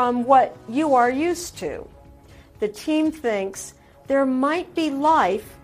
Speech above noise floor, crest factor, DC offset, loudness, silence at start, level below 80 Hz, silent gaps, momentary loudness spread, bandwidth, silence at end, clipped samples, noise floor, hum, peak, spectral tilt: 26 dB; 18 dB; under 0.1%; -21 LUFS; 0 s; -54 dBFS; none; 14 LU; 15.5 kHz; 0.1 s; under 0.1%; -47 dBFS; none; -4 dBFS; -4.5 dB/octave